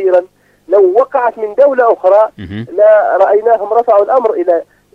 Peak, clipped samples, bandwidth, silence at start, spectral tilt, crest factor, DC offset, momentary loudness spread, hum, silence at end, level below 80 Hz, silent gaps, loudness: 0 dBFS; 0.1%; 5.2 kHz; 0 s; -8 dB/octave; 10 dB; under 0.1%; 7 LU; none; 0.3 s; -54 dBFS; none; -10 LUFS